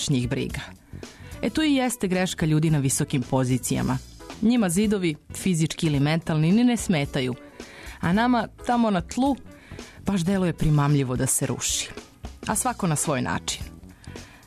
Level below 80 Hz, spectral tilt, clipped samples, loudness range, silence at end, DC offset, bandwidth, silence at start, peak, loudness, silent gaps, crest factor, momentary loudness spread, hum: -44 dBFS; -5 dB/octave; under 0.1%; 2 LU; 0.2 s; under 0.1%; 13.5 kHz; 0 s; -12 dBFS; -24 LUFS; none; 12 dB; 19 LU; none